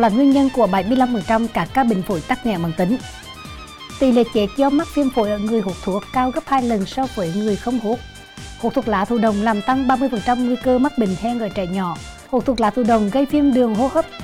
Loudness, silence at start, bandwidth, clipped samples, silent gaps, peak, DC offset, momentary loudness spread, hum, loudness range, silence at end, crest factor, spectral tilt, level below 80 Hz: -19 LUFS; 0 s; 15.5 kHz; under 0.1%; none; -4 dBFS; under 0.1%; 9 LU; none; 2 LU; 0 s; 14 dB; -6.5 dB/octave; -42 dBFS